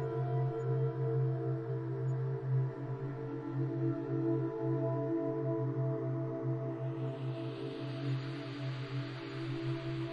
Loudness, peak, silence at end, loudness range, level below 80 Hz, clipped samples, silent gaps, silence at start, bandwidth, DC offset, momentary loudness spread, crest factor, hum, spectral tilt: -37 LUFS; -22 dBFS; 0 s; 4 LU; -68 dBFS; under 0.1%; none; 0 s; 5 kHz; under 0.1%; 6 LU; 12 dB; none; -9.5 dB/octave